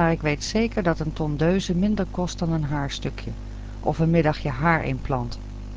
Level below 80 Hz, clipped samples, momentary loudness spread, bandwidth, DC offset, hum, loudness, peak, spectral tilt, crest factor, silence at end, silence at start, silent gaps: -34 dBFS; under 0.1%; 12 LU; 8 kHz; under 0.1%; 50 Hz at -35 dBFS; -24 LUFS; -8 dBFS; -6.5 dB/octave; 16 dB; 0 s; 0 s; none